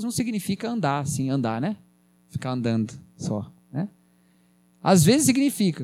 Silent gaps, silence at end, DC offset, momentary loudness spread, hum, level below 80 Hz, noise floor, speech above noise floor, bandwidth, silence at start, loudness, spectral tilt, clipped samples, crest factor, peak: none; 0 s; under 0.1%; 16 LU; none; -60 dBFS; -60 dBFS; 37 dB; 16.5 kHz; 0 s; -24 LUFS; -5 dB/octave; under 0.1%; 18 dB; -6 dBFS